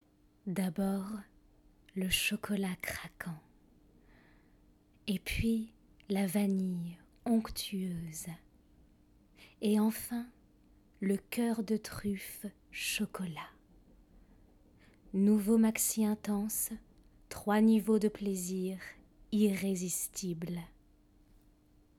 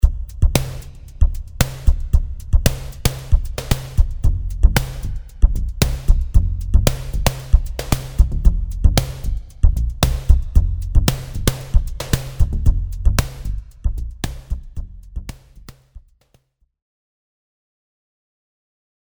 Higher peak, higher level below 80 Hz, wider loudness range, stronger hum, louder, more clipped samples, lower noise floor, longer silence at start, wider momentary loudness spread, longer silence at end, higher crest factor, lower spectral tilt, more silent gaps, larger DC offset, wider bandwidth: second, -18 dBFS vs 0 dBFS; second, -58 dBFS vs -18 dBFS; second, 7 LU vs 12 LU; neither; second, -34 LUFS vs -21 LUFS; neither; first, -65 dBFS vs -60 dBFS; first, 0.45 s vs 0.05 s; first, 17 LU vs 12 LU; second, 1.3 s vs 3.05 s; about the same, 18 dB vs 18 dB; about the same, -4.5 dB/octave vs -5 dB/octave; neither; neither; second, 17.5 kHz vs over 20 kHz